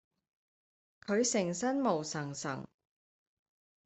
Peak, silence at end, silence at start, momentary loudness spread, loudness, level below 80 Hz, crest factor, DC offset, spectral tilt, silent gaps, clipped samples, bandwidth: -18 dBFS; 1.2 s; 1.1 s; 14 LU; -33 LUFS; -76 dBFS; 20 dB; under 0.1%; -4 dB/octave; none; under 0.1%; 8.4 kHz